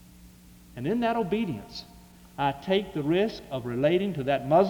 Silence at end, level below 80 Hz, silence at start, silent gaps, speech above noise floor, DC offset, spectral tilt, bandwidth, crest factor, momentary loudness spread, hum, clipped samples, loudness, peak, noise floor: 0 s; -56 dBFS; 0.2 s; none; 25 dB; under 0.1%; -7 dB/octave; over 20 kHz; 18 dB; 14 LU; none; under 0.1%; -28 LUFS; -10 dBFS; -51 dBFS